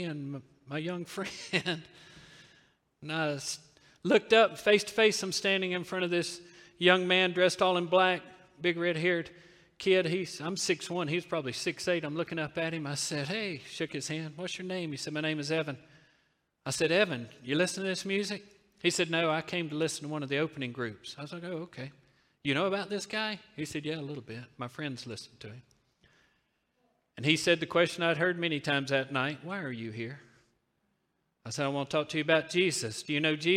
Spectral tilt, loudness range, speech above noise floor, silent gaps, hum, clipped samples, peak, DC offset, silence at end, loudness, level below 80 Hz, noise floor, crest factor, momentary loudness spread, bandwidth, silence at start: -4 dB/octave; 8 LU; 47 dB; none; none; under 0.1%; -8 dBFS; under 0.1%; 0 s; -31 LUFS; -74 dBFS; -78 dBFS; 24 dB; 15 LU; 15.5 kHz; 0 s